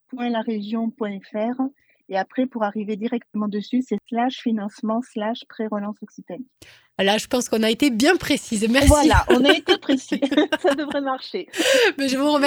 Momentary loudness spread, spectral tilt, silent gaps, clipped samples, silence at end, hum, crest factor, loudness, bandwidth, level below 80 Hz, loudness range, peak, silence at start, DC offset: 13 LU; -4.5 dB/octave; none; under 0.1%; 0 s; none; 20 dB; -21 LUFS; 17.5 kHz; -36 dBFS; 8 LU; 0 dBFS; 0.15 s; under 0.1%